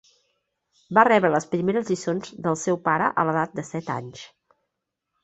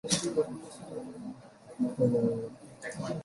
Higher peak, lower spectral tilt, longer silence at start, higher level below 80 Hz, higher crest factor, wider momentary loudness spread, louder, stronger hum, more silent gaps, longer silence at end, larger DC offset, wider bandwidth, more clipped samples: first, -4 dBFS vs -10 dBFS; about the same, -5.5 dB/octave vs -5 dB/octave; first, 0.9 s vs 0.05 s; about the same, -66 dBFS vs -66 dBFS; about the same, 22 dB vs 22 dB; second, 14 LU vs 17 LU; first, -23 LUFS vs -32 LUFS; neither; neither; first, 0.95 s vs 0 s; neither; second, 8.4 kHz vs 11.5 kHz; neither